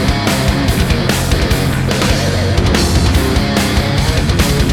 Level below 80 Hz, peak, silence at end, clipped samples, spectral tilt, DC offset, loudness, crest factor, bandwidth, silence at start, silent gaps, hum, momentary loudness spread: -18 dBFS; 0 dBFS; 0 s; under 0.1%; -5 dB/octave; under 0.1%; -13 LUFS; 12 dB; 18.5 kHz; 0 s; none; none; 2 LU